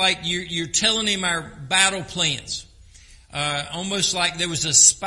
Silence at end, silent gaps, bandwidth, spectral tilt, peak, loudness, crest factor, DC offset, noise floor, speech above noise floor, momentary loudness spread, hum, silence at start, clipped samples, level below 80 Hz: 0 s; none; 11.5 kHz; -1 dB/octave; 0 dBFS; -20 LUFS; 22 dB; under 0.1%; -48 dBFS; 26 dB; 10 LU; none; 0 s; under 0.1%; -50 dBFS